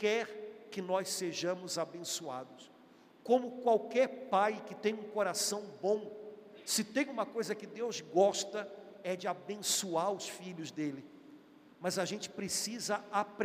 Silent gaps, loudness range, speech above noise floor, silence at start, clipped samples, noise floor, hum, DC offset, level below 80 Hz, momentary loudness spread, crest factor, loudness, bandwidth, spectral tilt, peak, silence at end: none; 4 LU; 26 dB; 0 s; under 0.1%; -61 dBFS; none; under 0.1%; -88 dBFS; 13 LU; 20 dB; -35 LUFS; 15.5 kHz; -3 dB/octave; -16 dBFS; 0 s